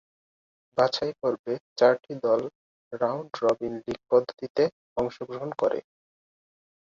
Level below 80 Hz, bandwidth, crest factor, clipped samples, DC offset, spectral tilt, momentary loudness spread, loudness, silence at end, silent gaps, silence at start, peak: -64 dBFS; 7.6 kHz; 20 dB; under 0.1%; under 0.1%; -5.5 dB/octave; 12 LU; -27 LUFS; 1.05 s; 1.39-1.44 s, 1.60-1.76 s, 2.55-2.91 s, 4.50-4.55 s, 4.72-4.96 s; 0.75 s; -8 dBFS